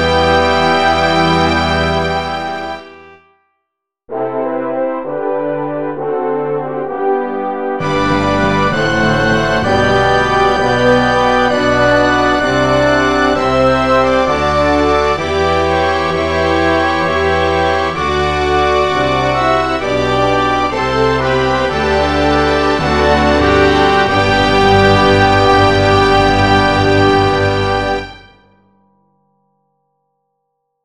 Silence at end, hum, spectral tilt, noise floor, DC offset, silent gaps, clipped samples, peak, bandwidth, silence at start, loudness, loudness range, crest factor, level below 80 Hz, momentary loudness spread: 2.65 s; none; -5.5 dB/octave; -75 dBFS; 1%; none; under 0.1%; 0 dBFS; 11.5 kHz; 0 s; -13 LUFS; 9 LU; 14 dB; -30 dBFS; 8 LU